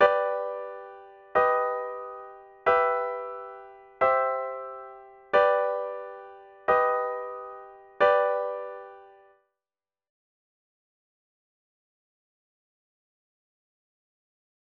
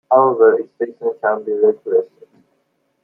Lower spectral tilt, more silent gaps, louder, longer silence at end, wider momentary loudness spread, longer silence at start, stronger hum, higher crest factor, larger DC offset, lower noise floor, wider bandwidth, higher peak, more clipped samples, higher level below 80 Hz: second, -5 dB/octave vs -10 dB/octave; neither; second, -26 LUFS vs -16 LUFS; first, 5.6 s vs 1 s; first, 21 LU vs 10 LU; about the same, 0 s vs 0.1 s; neither; first, 22 dB vs 16 dB; neither; first, under -90 dBFS vs -66 dBFS; first, 6.2 kHz vs 2.1 kHz; second, -6 dBFS vs -2 dBFS; neither; about the same, -70 dBFS vs -70 dBFS